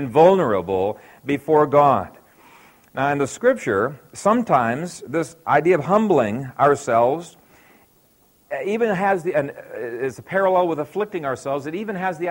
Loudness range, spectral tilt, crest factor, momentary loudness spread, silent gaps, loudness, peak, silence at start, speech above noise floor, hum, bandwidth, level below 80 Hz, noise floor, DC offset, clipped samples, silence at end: 4 LU; -6.5 dB/octave; 18 dB; 12 LU; none; -20 LUFS; -2 dBFS; 0 s; 38 dB; none; 16.5 kHz; -60 dBFS; -58 dBFS; under 0.1%; under 0.1%; 0 s